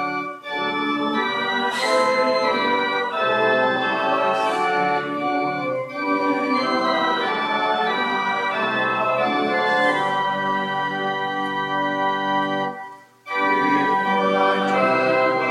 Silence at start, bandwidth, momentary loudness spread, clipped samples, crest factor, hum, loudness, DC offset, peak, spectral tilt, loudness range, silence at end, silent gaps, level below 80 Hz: 0 s; 13 kHz; 5 LU; under 0.1%; 14 dB; none; -21 LUFS; under 0.1%; -6 dBFS; -4.5 dB/octave; 2 LU; 0 s; none; -80 dBFS